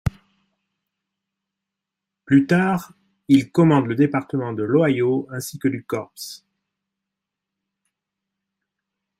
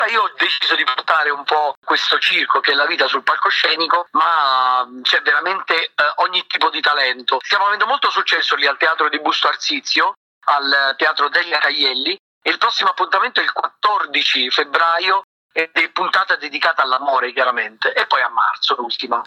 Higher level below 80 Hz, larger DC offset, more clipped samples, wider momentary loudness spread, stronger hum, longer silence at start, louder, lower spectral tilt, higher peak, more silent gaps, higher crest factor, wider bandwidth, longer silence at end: first, -50 dBFS vs -76 dBFS; neither; neither; first, 13 LU vs 4 LU; neither; about the same, 0.05 s vs 0 s; second, -20 LUFS vs -16 LUFS; first, -7 dB/octave vs -0.5 dB/octave; about the same, -4 dBFS vs -2 dBFS; second, none vs 1.77-1.82 s, 10.17-10.41 s, 12.19-12.41 s, 15.24-15.49 s; first, 20 dB vs 14 dB; first, 15.5 kHz vs 13.5 kHz; first, 2.85 s vs 0 s